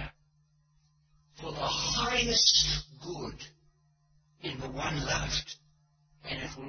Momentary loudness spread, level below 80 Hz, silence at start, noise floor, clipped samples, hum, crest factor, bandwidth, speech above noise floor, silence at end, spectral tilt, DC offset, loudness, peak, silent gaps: 23 LU; -48 dBFS; 0 s; -69 dBFS; under 0.1%; none; 24 dB; 6.6 kHz; 37 dB; 0 s; -2 dB/octave; under 0.1%; -28 LUFS; -10 dBFS; none